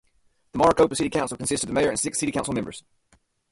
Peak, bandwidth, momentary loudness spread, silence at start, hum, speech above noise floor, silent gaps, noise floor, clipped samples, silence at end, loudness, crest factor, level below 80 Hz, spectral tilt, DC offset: -6 dBFS; 11.5 kHz; 13 LU; 0.55 s; none; 41 dB; none; -64 dBFS; under 0.1%; 0.7 s; -23 LUFS; 20 dB; -50 dBFS; -4 dB/octave; under 0.1%